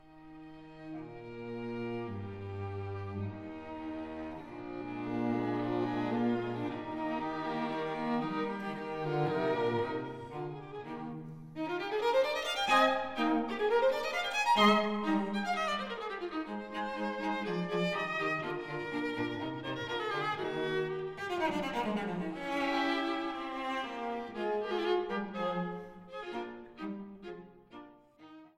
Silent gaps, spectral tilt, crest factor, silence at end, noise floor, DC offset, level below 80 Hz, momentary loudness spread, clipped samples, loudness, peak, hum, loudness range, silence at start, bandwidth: none; -5.5 dB/octave; 22 dB; 0.1 s; -56 dBFS; under 0.1%; -66 dBFS; 15 LU; under 0.1%; -34 LUFS; -14 dBFS; none; 11 LU; 0.05 s; 16 kHz